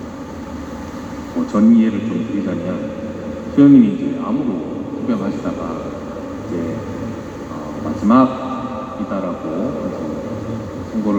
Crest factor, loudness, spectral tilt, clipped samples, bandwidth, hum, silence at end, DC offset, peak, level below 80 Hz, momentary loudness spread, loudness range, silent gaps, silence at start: 18 dB; -19 LUFS; -8 dB/octave; under 0.1%; 8.2 kHz; none; 0 s; under 0.1%; 0 dBFS; -44 dBFS; 17 LU; 8 LU; none; 0 s